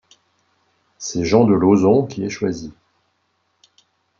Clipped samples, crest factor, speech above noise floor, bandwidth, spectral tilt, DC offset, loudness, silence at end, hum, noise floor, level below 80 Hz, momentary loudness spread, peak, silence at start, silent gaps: under 0.1%; 18 dB; 51 dB; 7.6 kHz; -6.5 dB/octave; under 0.1%; -17 LUFS; 1.5 s; none; -68 dBFS; -54 dBFS; 17 LU; -2 dBFS; 1 s; none